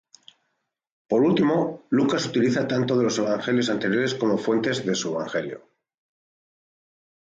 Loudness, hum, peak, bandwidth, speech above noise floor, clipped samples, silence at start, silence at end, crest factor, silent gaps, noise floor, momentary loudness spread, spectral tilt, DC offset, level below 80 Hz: -23 LUFS; none; -10 dBFS; 9.2 kHz; 55 dB; under 0.1%; 1.1 s; 1.65 s; 14 dB; none; -77 dBFS; 6 LU; -5 dB/octave; under 0.1%; -68 dBFS